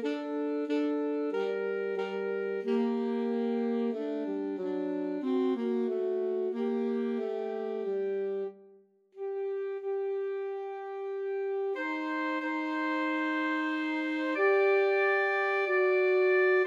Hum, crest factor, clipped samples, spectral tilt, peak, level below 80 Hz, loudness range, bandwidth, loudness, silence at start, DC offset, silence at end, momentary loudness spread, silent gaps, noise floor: none; 14 dB; under 0.1%; -6.5 dB/octave; -16 dBFS; under -90 dBFS; 7 LU; 7.2 kHz; -31 LUFS; 0 s; under 0.1%; 0 s; 9 LU; none; -60 dBFS